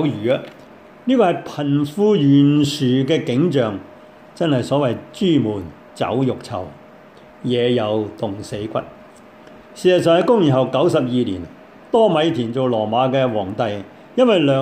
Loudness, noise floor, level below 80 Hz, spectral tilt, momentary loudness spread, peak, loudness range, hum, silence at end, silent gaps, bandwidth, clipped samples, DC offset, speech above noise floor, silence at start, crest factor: -18 LUFS; -43 dBFS; -58 dBFS; -7 dB/octave; 14 LU; -4 dBFS; 6 LU; none; 0 s; none; 14 kHz; under 0.1%; under 0.1%; 26 dB; 0 s; 16 dB